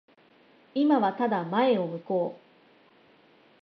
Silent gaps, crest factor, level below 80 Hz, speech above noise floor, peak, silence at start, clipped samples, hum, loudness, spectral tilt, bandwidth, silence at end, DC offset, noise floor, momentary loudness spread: none; 18 dB; -82 dBFS; 34 dB; -12 dBFS; 0.75 s; under 0.1%; none; -27 LUFS; -9 dB/octave; 5.8 kHz; 1.25 s; under 0.1%; -59 dBFS; 7 LU